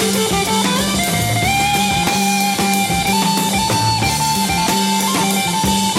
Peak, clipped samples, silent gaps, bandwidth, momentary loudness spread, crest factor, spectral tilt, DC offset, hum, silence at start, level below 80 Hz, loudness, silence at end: -2 dBFS; under 0.1%; none; 16.5 kHz; 1 LU; 14 dB; -3 dB/octave; under 0.1%; none; 0 s; -36 dBFS; -15 LUFS; 0 s